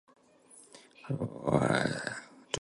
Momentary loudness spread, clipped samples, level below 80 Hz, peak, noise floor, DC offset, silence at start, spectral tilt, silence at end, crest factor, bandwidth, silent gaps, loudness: 25 LU; under 0.1%; -60 dBFS; -12 dBFS; -59 dBFS; under 0.1%; 0.55 s; -5 dB/octave; 0.05 s; 24 dB; 11.5 kHz; none; -32 LUFS